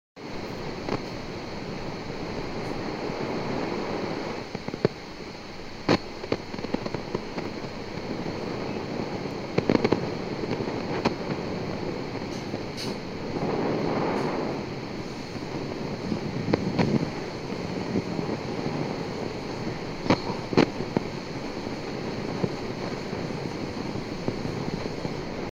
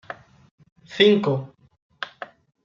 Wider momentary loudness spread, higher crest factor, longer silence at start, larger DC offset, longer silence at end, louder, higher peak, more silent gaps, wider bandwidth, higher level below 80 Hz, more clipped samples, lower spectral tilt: second, 9 LU vs 24 LU; first, 26 dB vs 20 dB; about the same, 0.15 s vs 0.1 s; neither; second, 0 s vs 0.4 s; second, -30 LUFS vs -19 LUFS; about the same, -4 dBFS vs -4 dBFS; second, none vs 0.51-0.58 s, 0.72-0.76 s, 1.82-1.90 s; first, 16 kHz vs 7.4 kHz; first, -48 dBFS vs -68 dBFS; neither; about the same, -6 dB/octave vs -6.5 dB/octave